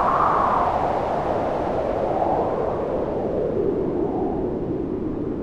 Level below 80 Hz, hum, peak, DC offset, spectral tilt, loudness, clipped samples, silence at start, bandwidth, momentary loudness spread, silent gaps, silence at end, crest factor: -40 dBFS; none; -6 dBFS; under 0.1%; -8.5 dB/octave; -23 LUFS; under 0.1%; 0 s; 10 kHz; 7 LU; none; 0 s; 16 dB